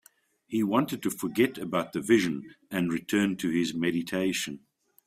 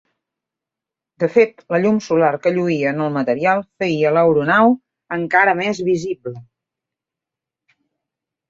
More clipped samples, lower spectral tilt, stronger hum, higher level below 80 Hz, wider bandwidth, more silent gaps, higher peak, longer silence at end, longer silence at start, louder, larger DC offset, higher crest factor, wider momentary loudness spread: neither; second, -5 dB/octave vs -6.5 dB/octave; neither; second, -68 dBFS vs -62 dBFS; first, 16 kHz vs 7.6 kHz; neither; second, -10 dBFS vs -2 dBFS; second, 0.5 s vs 2.05 s; second, 0.5 s vs 1.2 s; second, -28 LUFS vs -17 LUFS; neither; about the same, 18 dB vs 18 dB; about the same, 9 LU vs 10 LU